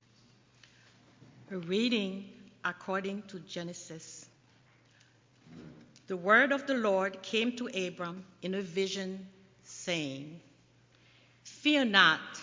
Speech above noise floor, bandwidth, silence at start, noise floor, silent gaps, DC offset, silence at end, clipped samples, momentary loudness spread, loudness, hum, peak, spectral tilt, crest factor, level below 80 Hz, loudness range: 32 dB; 7.6 kHz; 1.5 s; -64 dBFS; none; under 0.1%; 0 s; under 0.1%; 23 LU; -31 LUFS; none; -8 dBFS; -4 dB/octave; 26 dB; -78 dBFS; 11 LU